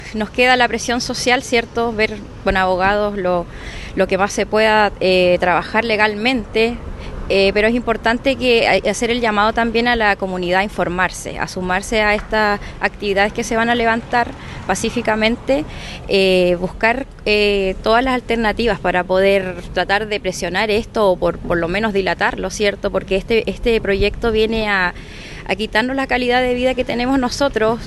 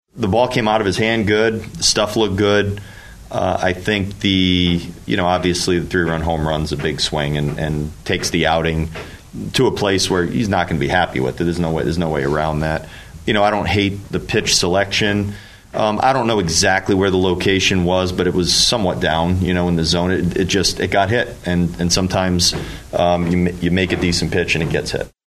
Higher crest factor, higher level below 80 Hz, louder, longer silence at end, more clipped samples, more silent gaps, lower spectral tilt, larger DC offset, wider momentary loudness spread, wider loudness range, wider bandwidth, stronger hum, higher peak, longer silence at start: about the same, 18 dB vs 18 dB; about the same, -34 dBFS vs -36 dBFS; about the same, -17 LUFS vs -17 LUFS; second, 0 s vs 0.2 s; neither; neither; about the same, -4.5 dB/octave vs -4.5 dB/octave; neither; about the same, 7 LU vs 7 LU; about the same, 2 LU vs 3 LU; about the same, 12.5 kHz vs 13.5 kHz; neither; about the same, 0 dBFS vs 0 dBFS; second, 0 s vs 0.15 s